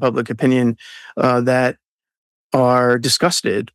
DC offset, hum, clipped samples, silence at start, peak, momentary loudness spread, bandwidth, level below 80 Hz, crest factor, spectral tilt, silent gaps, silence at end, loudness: under 0.1%; none; under 0.1%; 0 s; -4 dBFS; 7 LU; 15 kHz; -64 dBFS; 14 dB; -4.5 dB/octave; 1.88-1.99 s, 2.17-2.50 s; 0.1 s; -17 LUFS